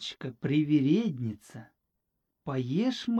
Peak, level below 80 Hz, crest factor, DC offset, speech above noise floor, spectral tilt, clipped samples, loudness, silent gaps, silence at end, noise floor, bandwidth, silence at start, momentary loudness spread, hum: -14 dBFS; -70 dBFS; 16 dB; under 0.1%; 53 dB; -7 dB/octave; under 0.1%; -29 LUFS; none; 0 s; -82 dBFS; 9.2 kHz; 0 s; 20 LU; none